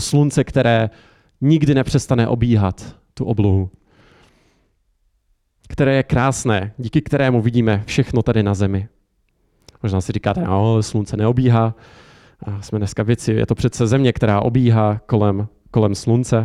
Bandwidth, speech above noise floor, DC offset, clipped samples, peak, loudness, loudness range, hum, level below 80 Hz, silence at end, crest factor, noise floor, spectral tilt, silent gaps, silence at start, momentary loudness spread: 12 kHz; 47 dB; under 0.1%; under 0.1%; -4 dBFS; -18 LUFS; 4 LU; none; -40 dBFS; 0 s; 14 dB; -64 dBFS; -7 dB/octave; none; 0 s; 10 LU